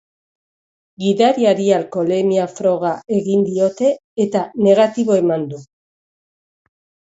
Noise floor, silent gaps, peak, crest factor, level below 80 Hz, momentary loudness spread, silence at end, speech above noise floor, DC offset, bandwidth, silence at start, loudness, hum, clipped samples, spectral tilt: under -90 dBFS; 4.04-4.16 s; -2 dBFS; 16 dB; -66 dBFS; 7 LU; 1.55 s; over 74 dB; under 0.1%; 8 kHz; 1 s; -17 LUFS; none; under 0.1%; -6.5 dB/octave